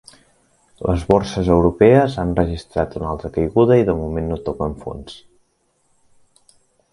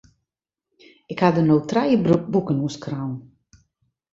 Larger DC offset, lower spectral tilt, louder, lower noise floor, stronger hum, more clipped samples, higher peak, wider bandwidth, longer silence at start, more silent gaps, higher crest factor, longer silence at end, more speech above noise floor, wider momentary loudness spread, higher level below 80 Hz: neither; about the same, -8 dB/octave vs -7.5 dB/octave; first, -18 LUFS vs -21 LUFS; second, -64 dBFS vs -84 dBFS; neither; neither; about the same, 0 dBFS vs -2 dBFS; first, 11.5 kHz vs 7.8 kHz; second, 0.8 s vs 1.1 s; neither; about the same, 18 dB vs 20 dB; first, 1.75 s vs 0.9 s; second, 47 dB vs 64 dB; about the same, 13 LU vs 13 LU; first, -34 dBFS vs -56 dBFS